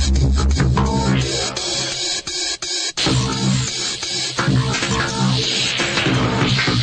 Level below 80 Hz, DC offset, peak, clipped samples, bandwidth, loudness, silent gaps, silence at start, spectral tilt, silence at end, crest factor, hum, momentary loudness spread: -26 dBFS; under 0.1%; -4 dBFS; under 0.1%; 10 kHz; -18 LUFS; none; 0 s; -4 dB/octave; 0 s; 14 dB; none; 3 LU